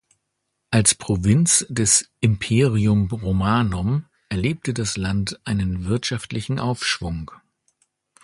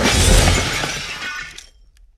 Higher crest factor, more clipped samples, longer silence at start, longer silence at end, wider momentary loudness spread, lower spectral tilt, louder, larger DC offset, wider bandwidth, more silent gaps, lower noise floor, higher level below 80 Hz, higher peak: about the same, 20 dB vs 18 dB; neither; first, 0.7 s vs 0 s; first, 0.9 s vs 0.6 s; second, 9 LU vs 15 LU; first, -4.5 dB/octave vs -3 dB/octave; second, -21 LUFS vs -17 LUFS; neither; second, 11.5 kHz vs 15 kHz; neither; first, -76 dBFS vs -48 dBFS; second, -40 dBFS vs -22 dBFS; about the same, -2 dBFS vs 0 dBFS